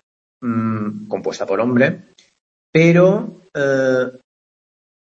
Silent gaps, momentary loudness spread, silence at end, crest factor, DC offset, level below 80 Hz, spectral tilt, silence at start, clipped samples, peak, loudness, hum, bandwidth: 2.40-2.73 s; 13 LU; 0.95 s; 18 dB; under 0.1%; -62 dBFS; -7 dB/octave; 0.4 s; under 0.1%; 0 dBFS; -17 LUFS; none; 7.6 kHz